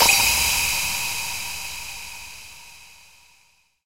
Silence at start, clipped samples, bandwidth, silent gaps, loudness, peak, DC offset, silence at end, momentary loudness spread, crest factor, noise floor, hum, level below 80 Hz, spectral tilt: 0 s; under 0.1%; 16 kHz; none; -21 LUFS; -2 dBFS; under 0.1%; 0 s; 24 LU; 22 dB; -61 dBFS; none; -44 dBFS; 0.5 dB/octave